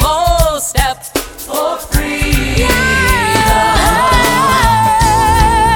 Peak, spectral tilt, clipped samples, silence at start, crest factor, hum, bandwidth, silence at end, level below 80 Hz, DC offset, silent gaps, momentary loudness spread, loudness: 0 dBFS; -3.5 dB/octave; under 0.1%; 0 s; 12 dB; none; 19 kHz; 0 s; -18 dBFS; under 0.1%; none; 7 LU; -11 LUFS